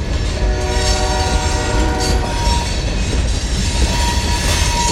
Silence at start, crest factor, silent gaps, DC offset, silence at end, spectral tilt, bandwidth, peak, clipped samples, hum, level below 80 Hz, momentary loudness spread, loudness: 0 s; 14 dB; none; under 0.1%; 0 s; -4 dB/octave; 15.5 kHz; -2 dBFS; under 0.1%; none; -18 dBFS; 3 LU; -17 LUFS